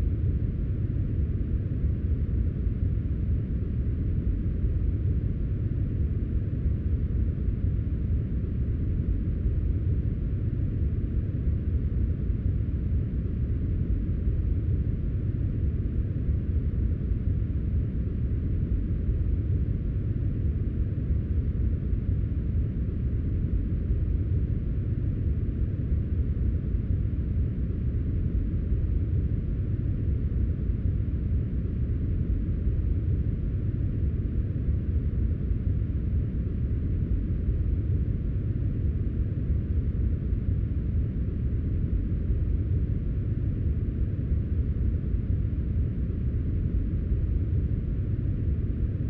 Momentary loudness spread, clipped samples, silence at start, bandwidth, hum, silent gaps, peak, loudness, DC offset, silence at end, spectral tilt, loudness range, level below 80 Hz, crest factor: 2 LU; under 0.1%; 0 s; 3.2 kHz; none; none; -14 dBFS; -29 LUFS; under 0.1%; 0 s; -12.5 dB/octave; 0 LU; -30 dBFS; 12 dB